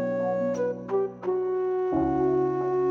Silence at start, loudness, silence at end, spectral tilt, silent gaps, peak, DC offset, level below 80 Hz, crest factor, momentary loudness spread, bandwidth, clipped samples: 0 s; -27 LUFS; 0 s; -9 dB/octave; none; -14 dBFS; under 0.1%; -54 dBFS; 12 dB; 5 LU; 6.4 kHz; under 0.1%